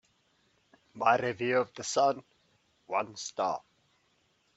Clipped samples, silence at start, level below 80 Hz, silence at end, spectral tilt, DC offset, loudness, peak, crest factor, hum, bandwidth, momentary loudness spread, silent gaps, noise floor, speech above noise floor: under 0.1%; 0.95 s; -76 dBFS; 0.95 s; -3.5 dB/octave; under 0.1%; -31 LUFS; -10 dBFS; 24 dB; none; 8.2 kHz; 9 LU; none; -72 dBFS; 42 dB